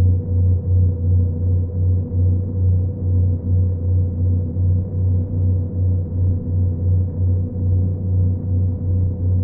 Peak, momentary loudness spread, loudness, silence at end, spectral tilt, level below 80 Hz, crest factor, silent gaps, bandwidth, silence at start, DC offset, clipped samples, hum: -8 dBFS; 2 LU; -19 LUFS; 0 s; -17 dB/octave; -38 dBFS; 10 dB; none; 1.1 kHz; 0 s; under 0.1%; under 0.1%; none